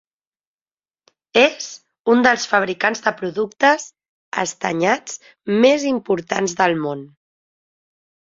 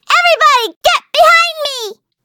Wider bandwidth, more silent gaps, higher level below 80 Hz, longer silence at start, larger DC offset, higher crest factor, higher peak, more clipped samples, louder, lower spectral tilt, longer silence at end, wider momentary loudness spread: second, 7.8 kHz vs over 20 kHz; first, 1.99-2.04 s, 4.09-4.32 s vs 0.76-0.81 s; second, -66 dBFS vs -50 dBFS; first, 1.35 s vs 0.1 s; neither; first, 20 dB vs 12 dB; about the same, -2 dBFS vs 0 dBFS; neither; second, -18 LUFS vs -10 LUFS; first, -3.5 dB/octave vs 1 dB/octave; first, 1.25 s vs 0.3 s; about the same, 13 LU vs 12 LU